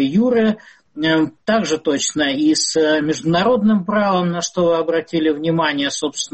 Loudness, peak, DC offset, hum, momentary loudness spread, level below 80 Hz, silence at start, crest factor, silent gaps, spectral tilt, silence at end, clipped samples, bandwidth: -17 LUFS; -6 dBFS; under 0.1%; none; 5 LU; -54 dBFS; 0 s; 12 dB; none; -4 dB/octave; 0.05 s; under 0.1%; 8.8 kHz